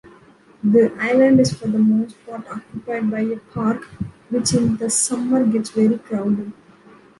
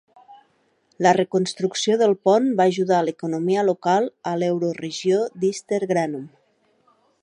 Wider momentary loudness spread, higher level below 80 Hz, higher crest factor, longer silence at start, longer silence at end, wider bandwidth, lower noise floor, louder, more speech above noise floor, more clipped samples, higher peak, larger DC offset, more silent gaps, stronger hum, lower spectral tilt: first, 16 LU vs 7 LU; first, -54 dBFS vs -72 dBFS; about the same, 16 dB vs 20 dB; second, 0.05 s vs 0.3 s; second, 0.65 s vs 0.95 s; about the same, 11.5 kHz vs 10.5 kHz; second, -49 dBFS vs -64 dBFS; about the same, -19 LUFS vs -21 LUFS; second, 31 dB vs 44 dB; neither; about the same, -4 dBFS vs -2 dBFS; neither; neither; neither; about the same, -5 dB/octave vs -5 dB/octave